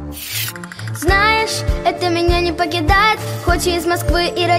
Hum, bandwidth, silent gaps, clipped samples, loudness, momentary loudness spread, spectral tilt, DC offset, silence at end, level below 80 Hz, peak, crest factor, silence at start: none; 16.5 kHz; none; under 0.1%; -16 LUFS; 9 LU; -4.5 dB/octave; under 0.1%; 0 s; -26 dBFS; -2 dBFS; 14 dB; 0 s